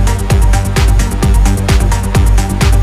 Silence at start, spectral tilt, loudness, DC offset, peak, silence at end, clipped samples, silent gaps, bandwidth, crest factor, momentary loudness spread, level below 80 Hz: 0 s; -5.5 dB/octave; -12 LUFS; under 0.1%; 0 dBFS; 0 s; under 0.1%; none; 14.5 kHz; 8 dB; 1 LU; -10 dBFS